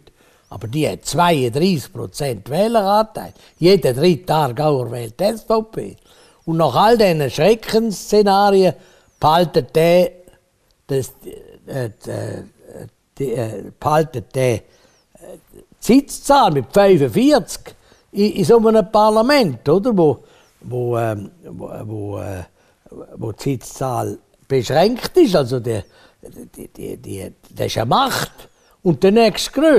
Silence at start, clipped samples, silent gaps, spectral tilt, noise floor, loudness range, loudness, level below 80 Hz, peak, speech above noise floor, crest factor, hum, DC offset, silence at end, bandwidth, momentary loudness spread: 0.5 s; under 0.1%; none; -6 dB/octave; -60 dBFS; 10 LU; -17 LUFS; -46 dBFS; -4 dBFS; 44 dB; 14 dB; none; under 0.1%; 0 s; 15.5 kHz; 18 LU